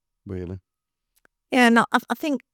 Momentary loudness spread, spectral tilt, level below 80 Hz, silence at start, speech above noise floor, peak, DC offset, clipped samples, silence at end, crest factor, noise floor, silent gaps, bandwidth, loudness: 20 LU; -4.5 dB/octave; -66 dBFS; 0.25 s; 52 dB; -4 dBFS; under 0.1%; under 0.1%; 0.15 s; 20 dB; -74 dBFS; none; 18 kHz; -20 LUFS